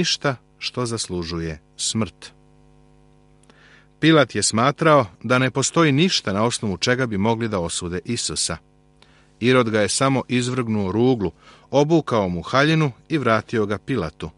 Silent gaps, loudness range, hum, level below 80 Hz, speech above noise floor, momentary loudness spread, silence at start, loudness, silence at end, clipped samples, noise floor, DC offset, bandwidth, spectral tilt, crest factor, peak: none; 7 LU; none; -50 dBFS; 34 dB; 9 LU; 0 s; -20 LUFS; 0.05 s; under 0.1%; -54 dBFS; under 0.1%; 11.5 kHz; -4.5 dB/octave; 20 dB; -2 dBFS